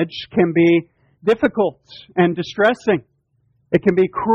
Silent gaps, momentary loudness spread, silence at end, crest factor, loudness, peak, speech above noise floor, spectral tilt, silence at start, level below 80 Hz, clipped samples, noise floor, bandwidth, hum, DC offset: none; 7 LU; 0 s; 16 dB; -18 LUFS; -2 dBFS; 46 dB; -7.5 dB/octave; 0 s; -54 dBFS; under 0.1%; -63 dBFS; 7.2 kHz; none; under 0.1%